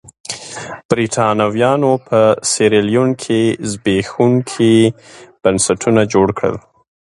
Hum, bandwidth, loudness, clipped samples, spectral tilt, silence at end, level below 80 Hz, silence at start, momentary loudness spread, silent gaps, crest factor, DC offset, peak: none; 11.5 kHz; -14 LUFS; under 0.1%; -5 dB/octave; 0.45 s; -48 dBFS; 0.3 s; 12 LU; 0.85-0.89 s; 14 dB; under 0.1%; 0 dBFS